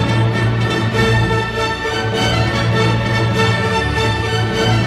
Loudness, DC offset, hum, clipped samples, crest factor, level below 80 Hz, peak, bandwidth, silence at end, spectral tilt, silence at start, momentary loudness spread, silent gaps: -16 LUFS; under 0.1%; none; under 0.1%; 14 dB; -30 dBFS; -2 dBFS; 13 kHz; 0 s; -5.5 dB/octave; 0 s; 3 LU; none